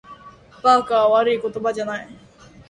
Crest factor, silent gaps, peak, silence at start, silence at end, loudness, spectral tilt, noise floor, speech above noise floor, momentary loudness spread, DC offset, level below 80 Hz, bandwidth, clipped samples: 20 dB; none; -2 dBFS; 0.1 s; 0.55 s; -19 LUFS; -4.5 dB/octave; -45 dBFS; 27 dB; 12 LU; under 0.1%; -58 dBFS; 11 kHz; under 0.1%